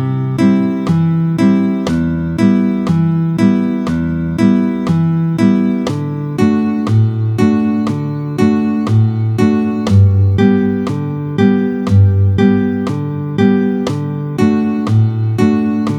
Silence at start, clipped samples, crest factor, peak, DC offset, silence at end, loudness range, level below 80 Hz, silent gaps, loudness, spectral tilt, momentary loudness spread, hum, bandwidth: 0 s; under 0.1%; 12 dB; 0 dBFS; under 0.1%; 0 s; 2 LU; -42 dBFS; none; -14 LUFS; -8.5 dB/octave; 6 LU; none; 10 kHz